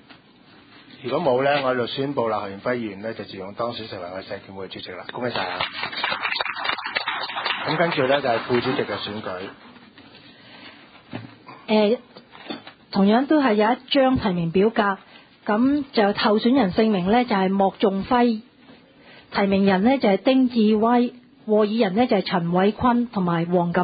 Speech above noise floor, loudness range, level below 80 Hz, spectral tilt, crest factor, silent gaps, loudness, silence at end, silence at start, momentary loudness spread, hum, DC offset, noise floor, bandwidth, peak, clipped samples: 30 dB; 8 LU; -54 dBFS; -11 dB/octave; 18 dB; none; -21 LUFS; 0 s; 0.1 s; 16 LU; none; under 0.1%; -51 dBFS; 5 kHz; -4 dBFS; under 0.1%